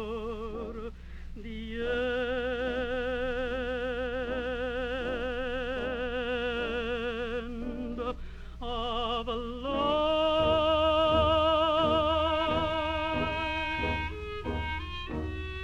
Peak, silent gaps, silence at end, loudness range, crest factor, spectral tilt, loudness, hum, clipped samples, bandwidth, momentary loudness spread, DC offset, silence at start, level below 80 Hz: -14 dBFS; none; 0 s; 8 LU; 18 dB; -6 dB/octave; -30 LUFS; 60 Hz at -45 dBFS; under 0.1%; 9.4 kHz; 12 LU; under 0.1%; 0 s; -42 dBFS